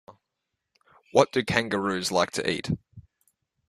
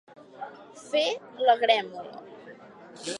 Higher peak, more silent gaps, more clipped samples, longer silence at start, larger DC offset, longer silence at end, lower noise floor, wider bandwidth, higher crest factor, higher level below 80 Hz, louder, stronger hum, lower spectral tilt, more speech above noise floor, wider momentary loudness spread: first, -2 dBFS vs -6 dBFS; neither; neither; about the same, 0.1 s vs 0.2 s; neither; first, 0.7 s vs 0 s; first, -83 dBFS vs -48 dBFS; first, 14 kHz vs 11.5 kHz; about the same, 26 dB vs 22 dB; first, -58 dBFS vs -82 dBFS; about the same, -26 LUFS vs -25 LUFS; neither; first, -4.5 dB/octave vs -2 dB/octave; first, 58 dB vs 22 dB; second, 8 LU vs 25 LU